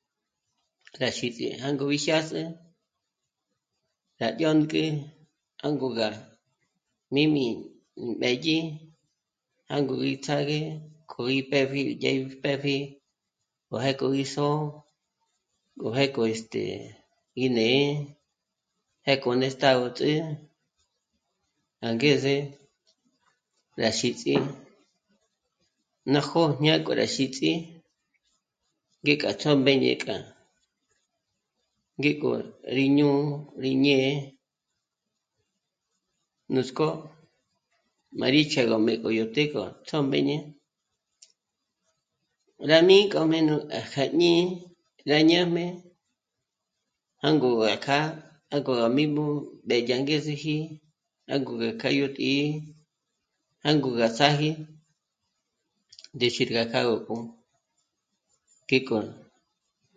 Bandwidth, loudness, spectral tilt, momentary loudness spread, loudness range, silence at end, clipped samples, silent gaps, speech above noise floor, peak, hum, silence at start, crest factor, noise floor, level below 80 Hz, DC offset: 9.4 kHz; -25 LUFS; -5.5 dB/octave; 14 LU; 6 LU; 0.8 s; under 0.1%; none; 59 dB; -2 dBFS; none; 0.95 s; 24 dB; -84 dBFS; -70 dBFS; under 0.1%